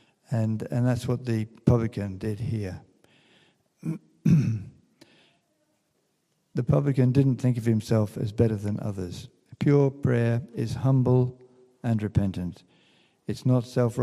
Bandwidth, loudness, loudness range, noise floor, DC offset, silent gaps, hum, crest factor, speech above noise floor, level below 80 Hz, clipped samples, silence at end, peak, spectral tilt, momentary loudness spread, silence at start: 12 kHz; -26 LUFS; 5 LU; -73 dBFS; under 0.1%; none; none; 22 dB; 48 dB; -54 dBFS; under 0.1%; 0 s; -4 dBFS; -8.5 dB/octave; 13 LU; 0.3 s